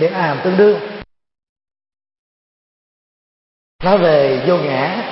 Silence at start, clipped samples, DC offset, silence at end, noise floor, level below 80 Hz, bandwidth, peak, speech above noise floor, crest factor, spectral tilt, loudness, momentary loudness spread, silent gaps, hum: 0 s; under 0.1%; under 0.1%; 0 s; under -90 dBFS; -50 dBFS; 5.8 kHz; 0 dBFS; over 76 dB; 18 dB; -10.5 dB/octave; -14 LUFS; 10 LU; 1.49-1.56 s, 2.19-3.79 s; none